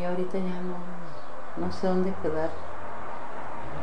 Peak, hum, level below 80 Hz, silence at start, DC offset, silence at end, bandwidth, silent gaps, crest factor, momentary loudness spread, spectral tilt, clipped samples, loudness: -14 dBFS; none; -54 dBFS; 0 s; 6%; 0 s; 10 kHz; none; 16 dB; 12 LU; -7.5 dB/octave; under 0.1%; -33 LUFS